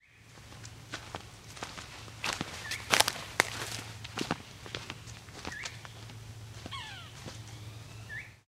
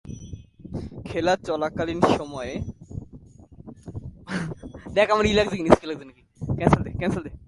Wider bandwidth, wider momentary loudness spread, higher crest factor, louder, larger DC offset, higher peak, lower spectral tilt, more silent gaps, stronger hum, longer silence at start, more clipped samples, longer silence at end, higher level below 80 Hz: first, 16.5 kHz vs 11.5 kHz; about the same, 18 LU vs 20 LU; first, 36 dB vs 26 dB; second, -36 LUFS vs -24 LUFS; neither; about the same, -2 dBFS vs 0 dBFS; second, -2 dB/octave vs -6 dB/octave; neither; neither; about the same, 0.05 s vs 0.05 s; neither; about the same, 0.05 s vs 0.1 s; second, -60 dBFS vs -42 dBFS